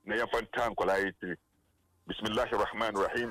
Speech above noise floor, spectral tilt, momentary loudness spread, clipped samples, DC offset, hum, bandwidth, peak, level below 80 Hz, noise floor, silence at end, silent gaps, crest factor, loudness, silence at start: 40 dB; -4.5 dB/octave; 11 LU; under 0.1%; under 0.1%; none; 16 kHz; -20 dBFS; -56 dBFS; -72 dBFS; 0 s; none; 14 dB; -32 LUFS; 0.05 s